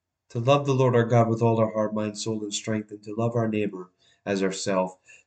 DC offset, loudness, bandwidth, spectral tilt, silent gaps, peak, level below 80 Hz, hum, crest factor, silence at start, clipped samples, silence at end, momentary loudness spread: under 0.1%; -25 LUFS; 9.2 kHz; -6 dB/octave; none; -8 dBFS; -68 dBFS; none; 18 dB; 0.35 s; under 0.1%; 0.35 s; 11 LU